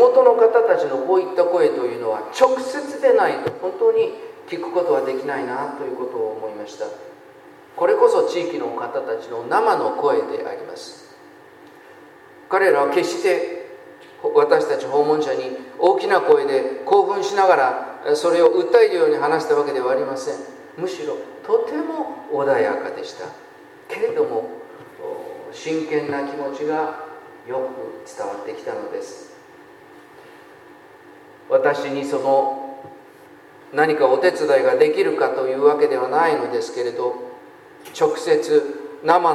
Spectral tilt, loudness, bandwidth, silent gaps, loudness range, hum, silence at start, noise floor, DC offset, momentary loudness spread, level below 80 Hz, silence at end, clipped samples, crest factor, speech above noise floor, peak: -4.5 dB/octave; -20 LUFS; 12.5 kHz; none; 9 LU; none; 0 s; -45 dBFS; under 0.1%; 16 LU; -74 dBFS; 0 s; under 0.1%; 20 dB; 26 dB; 0 dBFS